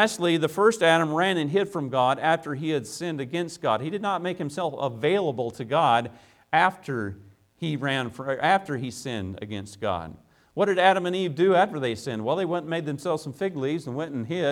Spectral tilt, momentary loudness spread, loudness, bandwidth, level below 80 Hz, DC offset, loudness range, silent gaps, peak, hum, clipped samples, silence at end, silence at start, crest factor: -5 dB/octave; 11 LU; -25 LUFS; 16.5 kHz; -64 dBFS; under 0.1%; 4 LU; none; -6 dBFS; none; under 0.1%; 0 s; 0 s; 20 dB